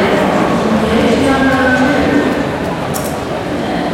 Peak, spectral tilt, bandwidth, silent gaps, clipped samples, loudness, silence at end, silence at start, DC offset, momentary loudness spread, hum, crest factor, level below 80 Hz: -2 dBFS; -5.5 dB/octave; 17 kHz; none; under 0.1%; -13 LUFS; 0 s; 0 s; under 0.1%; 7 LU; none; 12 dB; -36 dBFS